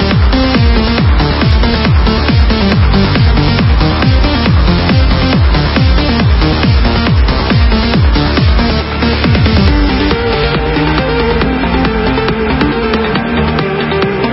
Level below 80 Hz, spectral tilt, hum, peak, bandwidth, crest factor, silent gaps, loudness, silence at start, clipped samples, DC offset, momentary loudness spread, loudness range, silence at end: -14 dBFS; -9.5 dB/octave; none; 0 dBFS; 5.8 kHz; 10 dB; none; -10 LUFS; 0 s; under 0.1%; under 0.1%; 3 LU; 2 LU; 0 s